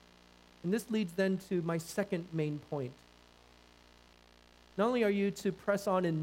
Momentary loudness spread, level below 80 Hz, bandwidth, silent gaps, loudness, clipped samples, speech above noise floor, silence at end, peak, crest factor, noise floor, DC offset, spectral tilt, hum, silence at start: 10 LU; -68 dBFS; 16 kHz; none; -34 LUFS; under 0.1%; 28 dB; 0 s; -18 dBFS; 18 dB; -61 dBFS; under 0.1%; -6.5 dB/octave; 60 Hz at -65 dBFS; 0.65 s